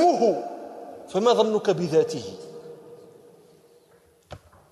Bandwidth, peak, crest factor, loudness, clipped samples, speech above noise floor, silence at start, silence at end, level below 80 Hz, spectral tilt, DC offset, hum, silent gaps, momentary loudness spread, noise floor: 12.5 kHz; -8 dBFS; 18 dB; -23 LUFS; under 0.1%; 36 dB; 0 s; 0.35 s; -66 dBFS; -5.5 dB/octave; under 0.1%; none; none; 26 LU; -58 dBFS